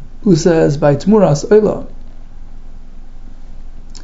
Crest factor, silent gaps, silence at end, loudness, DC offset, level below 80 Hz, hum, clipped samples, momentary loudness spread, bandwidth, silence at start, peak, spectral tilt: 14 dB; none; 0 s; -12 LUFS; under 0.1%; -28 dBFS; 60 Hz at -45 dBFS; under 0.1%; 5 LU; 8 kHz; 0 s; 0 dBFS; -7 dB/octave